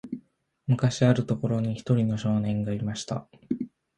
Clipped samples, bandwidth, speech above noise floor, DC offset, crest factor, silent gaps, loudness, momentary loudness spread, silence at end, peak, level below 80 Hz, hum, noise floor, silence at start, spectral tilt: under 0.1%; 9.2 kHz; 35 dB; under 0.1%; 18 dB; none; -27 LUFS; 13 LU; 0.3 s; -8 dBFS; -56 dBFS; none; -61 dBFS; 0.05 s; -7 dB/octave